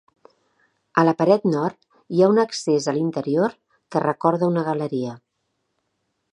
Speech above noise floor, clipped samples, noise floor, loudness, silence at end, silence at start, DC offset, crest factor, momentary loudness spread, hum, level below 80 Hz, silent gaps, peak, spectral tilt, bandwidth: 54 dB; under 0.1%; -74 dBFS; -21 LUFS; 1.15 s; 0.95 s; under 0.1%; 20 dB; 9 LU; none; -70 dBFS; none; -2 dBFS; -6.5 dB/octave; 10.5 kHz